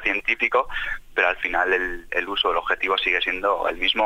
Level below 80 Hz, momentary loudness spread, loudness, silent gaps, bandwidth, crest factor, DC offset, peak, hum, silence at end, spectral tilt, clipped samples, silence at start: -44 dBFS; 6 LU; -22 LUFS; none; 16 kHz; 18 dB; under 0.1%; -6 dBFS; none; 0 s; -3 dB/octave; under 0.1%; 0 s